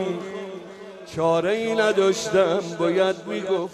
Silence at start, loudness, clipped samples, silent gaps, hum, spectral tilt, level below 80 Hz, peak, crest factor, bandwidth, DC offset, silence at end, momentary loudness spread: 0 s; -22 LUFS; under 0.1%; none; none; -4.5 dB/octave; -64 dBFS; -6 dBFS; 16 dB; 13 kHz; under 0.1%; 0 s; 16 LU